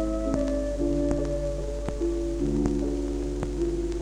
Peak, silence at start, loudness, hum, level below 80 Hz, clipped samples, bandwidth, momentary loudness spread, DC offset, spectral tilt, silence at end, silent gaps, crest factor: -10 dBFS; 0 s; -28 LUFS; none; -32 dBFS; under 0.1%; 10.5 kHz; 4 LU; under 0.1%; -7.5 dB/octave; 0 s; none; 16 dB